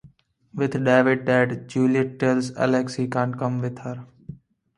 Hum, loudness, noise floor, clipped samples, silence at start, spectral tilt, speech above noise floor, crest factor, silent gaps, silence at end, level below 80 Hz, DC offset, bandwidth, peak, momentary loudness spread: none; -22 LUFS; -54 dBFS; under 0.1%; 0.05 s; -7 dB/octave; 32 dB; 20 dB; none; 0.45 s; -62 dBFS; under 0.1%; 11 kHz; -4 dBFS; 19 LU